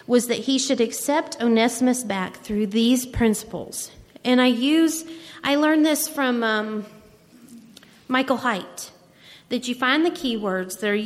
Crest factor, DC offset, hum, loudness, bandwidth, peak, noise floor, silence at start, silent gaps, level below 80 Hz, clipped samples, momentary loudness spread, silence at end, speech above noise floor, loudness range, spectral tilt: 16 dB; under 0.1%; none; -22 LUFS; 16 kHz; -6 dBFS; -50 dBFS; 0.1 s; none; -50 dBFS; under 0.1%; 12 LU; 0 s; 28 dB; 5 LU; -3.5 dB/octave